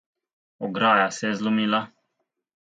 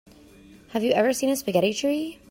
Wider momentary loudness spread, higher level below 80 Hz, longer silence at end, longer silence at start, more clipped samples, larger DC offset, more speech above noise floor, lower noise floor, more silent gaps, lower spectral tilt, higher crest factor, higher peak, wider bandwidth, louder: first, 14 LU vs 7 LU; second, -74 dBFS vs -62 dBFS; first, 0.85 s vs 0.15 s; about the same, 0.6 s vs 0.7 s; neither; neither; first, 55 dB vs 27 dB; first, -78 dBFS vs -50 dBFS; neither; about the same, -4.5 dB/octave vs -4 dB/octave; about the same, 20 dB vs 18 dB; first, -4 dBFS vs -8 dBFS; second, 9.2 kHz vs 16.5 kHz; about the same, -23 LUFS vs -24 LUFS